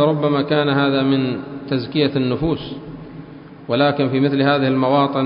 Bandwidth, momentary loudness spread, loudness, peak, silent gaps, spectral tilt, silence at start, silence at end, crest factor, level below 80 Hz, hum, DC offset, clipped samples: 5.4 kHz; 18 LU; -18 LUFS; -2 dBFS; none; -12 dB/octave; 0 s; 0 s; 16 dB; -48 dBFS; none; under 0.1%; under 0.1%